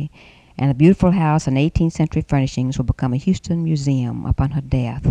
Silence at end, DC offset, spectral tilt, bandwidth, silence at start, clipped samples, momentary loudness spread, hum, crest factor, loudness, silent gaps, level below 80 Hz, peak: 0 s; under 0.1%; -8 dB/octave; 9.4 kHz; 0 s; under 0.1%; 7 LU; none; 16 dB; -19 LUFS; none; -32 dBFS; -2 dBFS